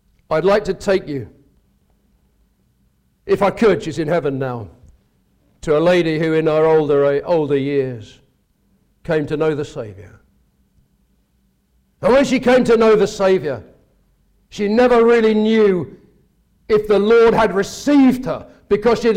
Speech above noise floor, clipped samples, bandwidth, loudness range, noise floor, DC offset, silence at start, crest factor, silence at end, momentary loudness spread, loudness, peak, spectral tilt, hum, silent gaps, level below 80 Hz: 46 dB; under 0.1%; 13 kHz; 8 LU; -62 dBFS; under 0.1%; 0.3 s; 12 dB; 0 s; 16 LU; -16 LUFS; -6 dBFS; -6.5 dB/octave; none; none; -46 dBFS